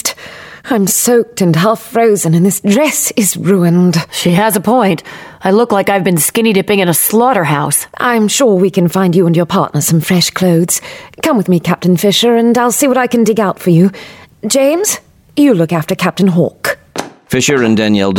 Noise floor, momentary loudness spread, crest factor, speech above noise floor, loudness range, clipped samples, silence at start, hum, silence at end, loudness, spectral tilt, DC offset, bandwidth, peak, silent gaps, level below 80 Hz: -32 dBFS; 8 LU; 12 dB; 21 dB; 2 LU; under 0.1%; 0.05 s; none; 0 s; -11 LUFS; -4.5 dB/octave; under 0.1%; 18 kHz; 0 dBFS; none; -50 dBFS